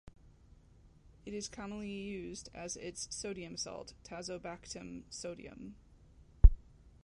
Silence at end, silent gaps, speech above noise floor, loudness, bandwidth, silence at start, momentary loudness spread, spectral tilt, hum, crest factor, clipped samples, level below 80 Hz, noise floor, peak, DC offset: 0.45 s; none; 17 dB; -39 LUFS; 11 kHz; 1.25 s; 19 LU; -5 dB/octave; none; 28 dB; under 0.1%; -36 dBFS; -62 dBFS; -8 dBFS; under 0.1%